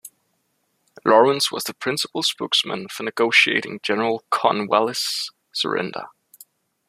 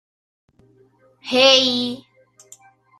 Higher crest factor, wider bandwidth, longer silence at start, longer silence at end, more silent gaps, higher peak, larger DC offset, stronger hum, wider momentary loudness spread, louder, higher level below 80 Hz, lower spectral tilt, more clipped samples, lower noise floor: about the same, 20 dB vs 22 dB; first, 15 kHz vs 13.5 kHz; second, 0.05 s vs 1.25 s; second, 0.8 s vs 1.05 s; neither; about the same, -2 dBFS vs -2 dBFS; neither; neither; second, 12 LU vs 24 LU; second, -20 LUFS vs -15 LUFS; about the same, -70 dBFS vs -66 dBFS; about the same, -2.5 dB/octave vs -1.5 dB/octave; neither; first, -70 dBFS vs -56 dBFS